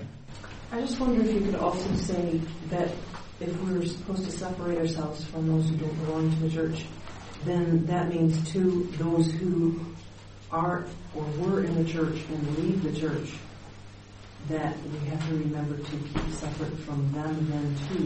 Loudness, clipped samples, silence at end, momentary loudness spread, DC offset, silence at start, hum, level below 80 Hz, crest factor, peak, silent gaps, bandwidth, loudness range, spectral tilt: -29 LUFS; under 0.1%; 0 s; 16 LU; under 0.1%; 0 s; none; -46 dBFS; 16 dB; -12 dBFS; none; 8.8 kHz; 5 LU; -7 dB/octave